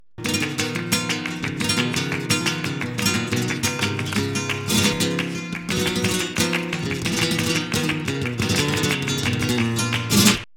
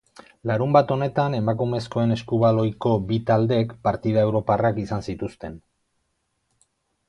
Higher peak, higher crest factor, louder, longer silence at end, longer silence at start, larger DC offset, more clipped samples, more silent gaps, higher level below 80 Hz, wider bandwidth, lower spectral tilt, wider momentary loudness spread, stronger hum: about the same, -2 dBFS vs -2 dBFS; about the same, 22 dB vs 20 dB; about the same, -22 LUFS vs -22 LUFS; second, 0 s vs 1.5 s; second, 0 s vs 0.45 s; neither; neither; neither; about the same, -48 dBFS vs -52 dBFS; first, 19 kHz vs 10 kHz; second, -3.5 dB/octave vs -8.5 dB/octave; second, 6 LU vs 12 LU; neither